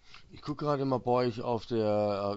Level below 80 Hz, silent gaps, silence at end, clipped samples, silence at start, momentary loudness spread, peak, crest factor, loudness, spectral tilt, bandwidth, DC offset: -60 dBFS; none; 0 s; under 0.1%; 0.1 s; 8 LU; -16 dBFS; 16 dB; -31 LUFS; -8 dB/octave; 8 kHz; under 0.1%